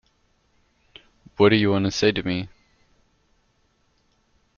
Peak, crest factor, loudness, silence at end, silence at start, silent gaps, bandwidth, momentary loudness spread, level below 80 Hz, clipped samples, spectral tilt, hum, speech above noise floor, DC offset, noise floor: -6 dBFS; 20 dB; -21 LUFS; 2.1 s; 1.4 s; none; 7.2 kHz; 18 LU; -54 dBFS; under 0.1%; -4.5 dB/octave; none; 46 dB; under 0.1%; -66 dBFS